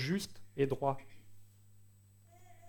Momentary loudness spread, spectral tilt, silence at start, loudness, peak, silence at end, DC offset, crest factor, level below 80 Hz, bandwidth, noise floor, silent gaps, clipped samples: 11 LU; -6 dB/octave; 0 s; -37 LUFS; -18 dBFS; 0 s; under 0.1%; 20 dB; -66 dBFS; 19 kHz; -62 dBFS; none; under 0.1%